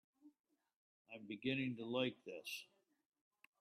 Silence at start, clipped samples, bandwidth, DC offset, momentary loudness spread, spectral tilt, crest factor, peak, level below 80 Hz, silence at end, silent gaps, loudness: 0.25 s; under 0.1%; 13.5 kHz; under 0.1%; 16 LU; -5 dB/octave; 20 dB; -28 dBFS; -88 dBFS; 0.95 s; 0.40-0.44 s, 0.76-1.05 s; -44 LUFS